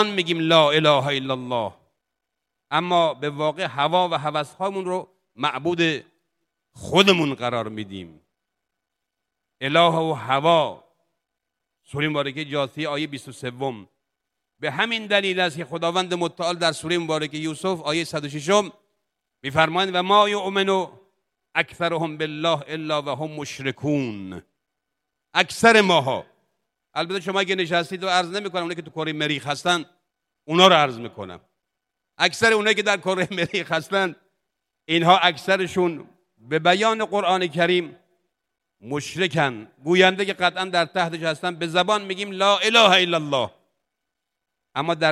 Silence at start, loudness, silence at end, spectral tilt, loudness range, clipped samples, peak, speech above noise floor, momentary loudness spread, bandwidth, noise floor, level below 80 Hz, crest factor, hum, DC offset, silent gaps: 0 s; -21 LUFS; 0 s; -4 dB/octave; 5 LU; under 0.1%; 0 dBFS; 61 dB; 14 LU; 14.5 kHz; -82 dBFS; -68 dBFS; 22 dB; none; under 0.1%; none